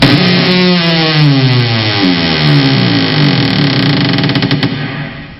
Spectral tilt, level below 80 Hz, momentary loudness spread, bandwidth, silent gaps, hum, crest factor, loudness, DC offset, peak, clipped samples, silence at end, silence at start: -7 dB/octave; -40 dBFS; 4 LU; 9.2 kHz; none; none; 10 dB; -9 LUFS; 0.2%; 0 dBFS; under 0.1%; 0 s; 0 s